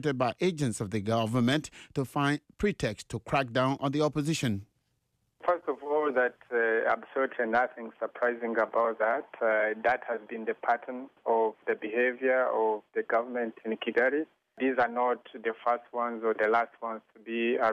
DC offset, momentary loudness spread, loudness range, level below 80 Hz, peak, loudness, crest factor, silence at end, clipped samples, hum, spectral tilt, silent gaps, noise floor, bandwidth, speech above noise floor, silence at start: under 0.1%; 8 LU; 1 LU; -62 dBFS; -16 dBFS; -30 LUFS; 14 dB; 0 s; under 0.1%; none; -5.5 dB/octave; none; -77 dBFS; 14 kHz; 47 dB; 0 s